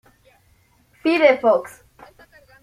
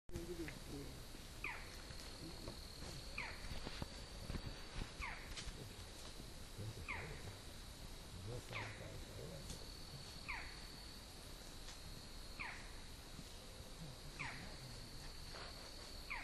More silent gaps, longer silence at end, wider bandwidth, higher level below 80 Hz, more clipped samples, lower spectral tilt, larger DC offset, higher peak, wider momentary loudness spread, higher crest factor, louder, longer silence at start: neither; first, 0.95 s vs 0 s; about the same, 14.5 kHz vs 13.5 kHz; second, -62 dBFS vs -56 dBFS; neither; about the same, -4.5 dB/octave vs -3.5 dB/octave; neither; first, -2 dBFS vs -28 dBFS; first, 12 LU vs 7 LU; about the same, 20 dB vs 22 dB; first, -18 LUFS vs -51 LUFS; first, 1.05 s vs 0.1 s